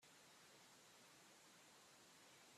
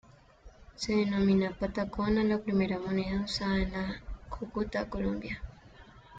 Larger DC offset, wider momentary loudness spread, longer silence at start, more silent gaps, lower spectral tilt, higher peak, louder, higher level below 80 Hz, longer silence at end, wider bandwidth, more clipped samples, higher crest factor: neither; second, 0 LU vs 13 LU; second, 0 s vs 0.45 s; neither; second, -1.5 dB/octave vs -6.5 dB/octave; second, -56 dBFS vs -16 dBFS; second, -66 LUFS vs -31 LUFS; second, under -90 dBFS vs -46 dBFS; about the same, 0 s vs 0 s; first, 14.5 kHz vs 7.8 kHz; neither; about the same, 12 dB vs 16 dB